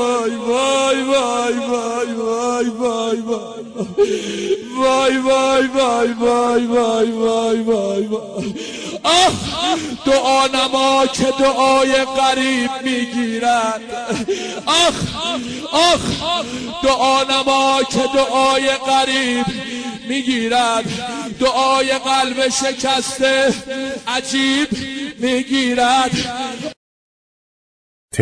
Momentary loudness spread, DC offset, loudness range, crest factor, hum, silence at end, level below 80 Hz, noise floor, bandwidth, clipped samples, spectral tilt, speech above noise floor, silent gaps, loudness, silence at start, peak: 10 LU; under 0.1%; 3 LU; 16 dB; none; 0 s; -48 dBFS; under -90 dBFS; 11 kHz; under 0.1%; -3 dB/octave; over 73 dB; 26.77-28.09 s; -17 LUFS; 0 s; -2 dBFS